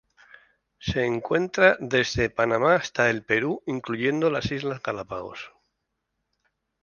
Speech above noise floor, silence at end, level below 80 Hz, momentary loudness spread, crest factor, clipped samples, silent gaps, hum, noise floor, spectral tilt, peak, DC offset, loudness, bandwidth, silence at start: 55 dB; 1.35 s; -52 dBFS; 15 LU; 22 dB; under 0.1%; none; none; -79 dBFS; -5 dB/octave; -4 dBFS; under 0.1%; -24 LUFS; 7.2 kHz; 0.8 s